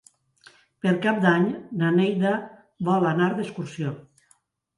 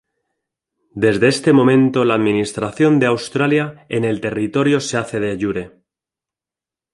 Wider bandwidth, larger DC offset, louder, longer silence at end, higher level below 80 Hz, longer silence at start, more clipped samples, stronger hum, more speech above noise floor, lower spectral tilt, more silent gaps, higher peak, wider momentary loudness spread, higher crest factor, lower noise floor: about the same, 11 kHz vs 11.5 kHz; neither; second, -24 LUFS vs -17 LUFS; second, 0.75 s vs 1.25 s; second, -70 dBFS vs -54 dBFS; about the same, 0.85 s vs 0.95 s; neither; neither; second, 42 dB vs 73 dB; first, -7.5 dB/octave vs -6 dB/octave; neither; about the same, -4 dBFS vs -2 dBFS; about the same, 12 LU vs 10 LU; about the same, 20 dB vs 16 dB; second, -64 dBFS vs -89 dBFS